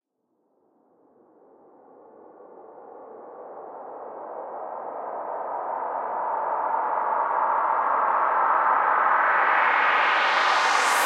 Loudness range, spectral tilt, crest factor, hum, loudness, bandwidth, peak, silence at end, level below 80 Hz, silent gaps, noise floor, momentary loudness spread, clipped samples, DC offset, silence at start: 21 LU; 0 dB/octave; 18 dB; none; -22 LUFS; 16 kHz; -8 dBFS; 0 s; -84 dBFS; none; -73 dBFS; 20 LU; under 0.1%; under 0.1%; 2.3 s